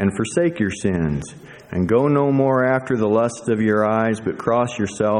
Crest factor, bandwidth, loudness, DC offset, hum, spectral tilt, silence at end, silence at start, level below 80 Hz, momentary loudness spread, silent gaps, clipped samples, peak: 16 dB; 11 kHz; -20 LUFS; under 0.1%; none; -6.5 dB/octave; 0 s; 0 s; -46 dBFS; 7 LU; none; under 0.1%; -4 dBFS